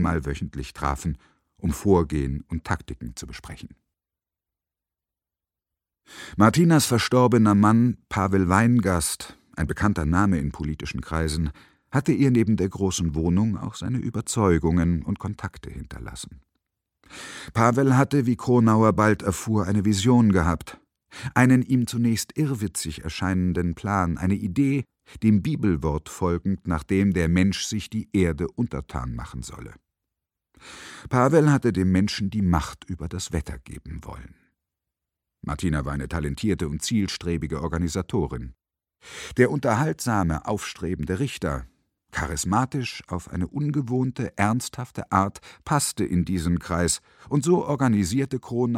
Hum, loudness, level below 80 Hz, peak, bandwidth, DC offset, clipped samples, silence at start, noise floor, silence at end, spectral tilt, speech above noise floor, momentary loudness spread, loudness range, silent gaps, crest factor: none; -23 LUFS; -40 dBFS; -2 dBFS; 16 kHz; under 0.1%; under 0.1%; 0 s; -90 dBFS; 0 s; -6 dB/octave; 67 dB; 18 LU; 8 LU; none; 22 dB